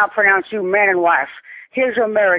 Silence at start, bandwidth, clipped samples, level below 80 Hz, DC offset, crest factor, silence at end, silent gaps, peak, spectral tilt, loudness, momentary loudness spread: 0 s; 4 kHz; under 0.1%; -62 dBFS; under 0.1%; 14 dB; 0 s; none; -2 dBFS; -7.5 dB/octave; -15 LUFS; 13 LU